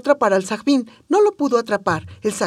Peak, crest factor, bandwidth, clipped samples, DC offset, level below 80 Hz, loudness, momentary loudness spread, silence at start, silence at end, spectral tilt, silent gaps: -2 dBFS; 16 dB; 13.5 kHz; under 0.1%; under 0.1%; -64 dBFS; -19 LUFS; 7 LU; 0.05 s; 0 s; -5 dB/octave; none